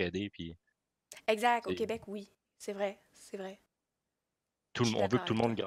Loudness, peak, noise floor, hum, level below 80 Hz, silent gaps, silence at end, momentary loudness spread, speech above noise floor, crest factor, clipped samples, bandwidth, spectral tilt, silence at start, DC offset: -34 LUFS; -14 dBFS; -88 dBFS; none; -72 dBFS; none; 0 s; 17 LU; 54 dB; 22 dB; under 0.1%; 16 kHz; -5 dB/octave; 0 s; under 0.1%